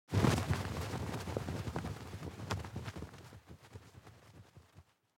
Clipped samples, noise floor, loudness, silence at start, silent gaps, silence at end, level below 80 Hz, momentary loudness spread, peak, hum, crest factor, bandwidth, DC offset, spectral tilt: under 0.1%; -64 dBFS; -39 LUFS; 0.1 s; none; 0.35 s; -54 dBFS; 25 LU; -16 dBFS; none; 24 dB; 16.5 kHz; under 0.1%; -6 dB/octave